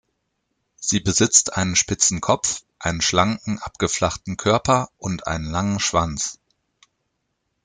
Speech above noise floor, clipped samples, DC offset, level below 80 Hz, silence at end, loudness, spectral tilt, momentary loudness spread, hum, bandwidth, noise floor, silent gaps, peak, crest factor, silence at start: 54 dB; under 0.1%; under 0.1%; -46 dBFS; 1.3 s; -20 LUFS; -3 dB/octave; 11 LU; none; 10.5 kHz; -75 dBFS; none; 0 dBFS; 22 dB; 0.8 s